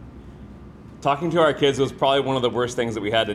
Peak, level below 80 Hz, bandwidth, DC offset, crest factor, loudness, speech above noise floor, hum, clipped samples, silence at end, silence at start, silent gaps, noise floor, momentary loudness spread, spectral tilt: -6 dBFS; -48 dBFS; 12.5 kHz; under 0.1%; 16 dB; -21 LUFS; 21 dB; none; under 0.1%; 0 s; 0 s; none; -42 dBFS; 23 LU; -5 dB/octave